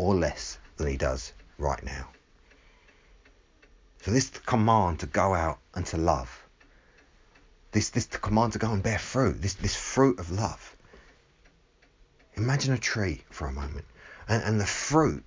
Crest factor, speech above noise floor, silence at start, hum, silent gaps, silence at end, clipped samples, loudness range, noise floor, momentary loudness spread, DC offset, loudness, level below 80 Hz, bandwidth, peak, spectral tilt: 22 dB; 35 dB; 0 s; none; none; 0.05 s; under 0.1%; 7 LU; -62 dBFS; 15 LU; under 0.1%; -28 LUFS; -42 dBFS; 7.6 kHz; -8 dBFS; -5 dB/octave